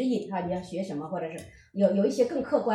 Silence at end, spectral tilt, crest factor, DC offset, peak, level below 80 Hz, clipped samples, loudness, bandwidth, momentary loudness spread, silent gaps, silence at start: 0 s; -7 dB/octave; 18 dB; under 0.1%; -10 dBFS; -62 dBFS; under 0.1%; -28 LUFS; 12 kHz; 13 LU; none; 0 s